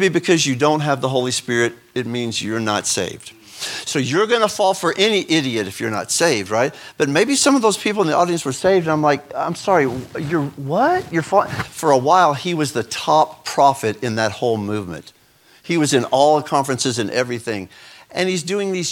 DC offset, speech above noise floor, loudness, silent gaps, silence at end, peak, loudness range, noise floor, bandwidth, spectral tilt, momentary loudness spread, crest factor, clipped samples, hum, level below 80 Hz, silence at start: under 0.1%; 32 dB; -18 LUFS; none; 0 s; 0 dBFS; 3 LU; -50 dBFS; 18 kHz; -4 dB/octave; 10 LU; 18 dB; under 0.1%; none; -58 dBFS; 0 s